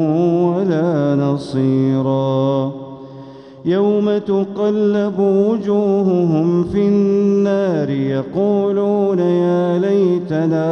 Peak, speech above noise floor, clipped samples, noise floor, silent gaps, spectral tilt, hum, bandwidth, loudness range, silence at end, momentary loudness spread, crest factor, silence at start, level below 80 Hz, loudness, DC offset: -4 dBFS; 21 dB; under 0.1%; -36 dBFS; none; -9 dB/octave; none; 8.4 kHz; 3 LU; 0 s; 5 LU; 12 dB; 0 s; -54 dBFS; -16 LUFS; under 0.1%